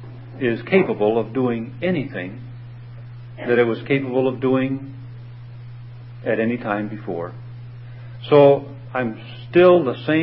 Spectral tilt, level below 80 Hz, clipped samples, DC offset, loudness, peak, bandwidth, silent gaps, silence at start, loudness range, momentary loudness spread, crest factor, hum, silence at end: -12 dB/octave; -54 dBFS; under 0.1%; under 0.1%; -20 LUFS; -2 dBFS; 5.6 kHz; none; 0 s; 8 LU; 24 LU; 20 dB; none; 0 s